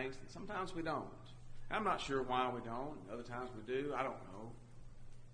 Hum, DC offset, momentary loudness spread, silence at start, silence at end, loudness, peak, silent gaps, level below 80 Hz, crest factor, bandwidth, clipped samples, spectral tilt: none; under 0.1%; 21 LU; 0 s; 0 s; -42 LUFS; -22 dBFS; none; -56 dBFS; 20 dB; 10 kHz; under 0.1%; -5.5 dB/octave